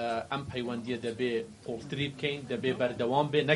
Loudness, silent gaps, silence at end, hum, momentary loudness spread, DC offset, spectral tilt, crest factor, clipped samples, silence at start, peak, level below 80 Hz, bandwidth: -32 LUFS; none; 0 s; none; 8 LU; under 0.1%; -6 dB/octave; 22 dB; under 0.1%; 0 s; -8 dBFS; -64 dBFS; 11.5 kHz